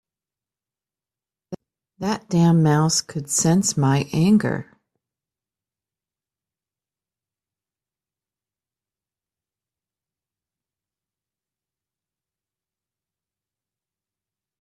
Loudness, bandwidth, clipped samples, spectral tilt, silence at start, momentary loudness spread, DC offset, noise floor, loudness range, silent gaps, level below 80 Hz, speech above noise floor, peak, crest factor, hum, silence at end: -19 LUFS; 14 kHz; under 0.1%; -5 dB/octave; 1.5 s; 21 LU; under 0.1%; under -90 dBFS; 7 LU; none; -60 dBFS; over 71 dB; -8 dBFS; 18 dB; none; 10 s